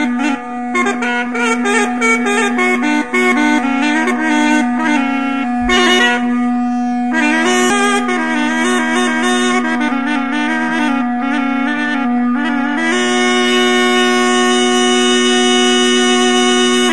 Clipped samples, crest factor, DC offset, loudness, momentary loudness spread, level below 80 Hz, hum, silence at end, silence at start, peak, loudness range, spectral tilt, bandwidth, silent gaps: under 0.1%; 14 dB; 2%; -13 LUFS; 5 LU; -46 dBFS; none; 0 s; 0 s; 0 dBFS; 4 LU; -2 dB/octave; 11.5 kHz; none